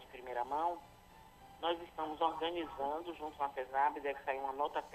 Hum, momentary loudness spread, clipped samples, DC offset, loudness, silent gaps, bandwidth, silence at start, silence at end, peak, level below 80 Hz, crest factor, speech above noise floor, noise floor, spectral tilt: none; 9 LU; under 0.1%; under 0.1%; -39 LUFS; none; 13 kHz; 0 s; 0 s; -20 dBFS; -68 dBFS; 20 dB; 21 dB; -60 dBFS; -4.5 dB/octave